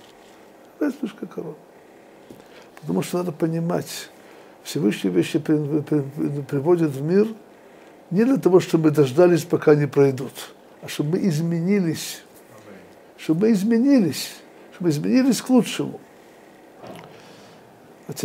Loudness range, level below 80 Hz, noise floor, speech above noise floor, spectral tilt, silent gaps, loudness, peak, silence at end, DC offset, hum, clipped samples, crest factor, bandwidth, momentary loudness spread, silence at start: 9 LU; -72 dBFS; -48 dBFS; 28 dB; -6.5 dB/octave; none; -21 LUFS; -4 dBFS; 0 s; under 0.1%; none; under 0.1%; 20 dB; 16 kHz; 20 LU; 0.8 s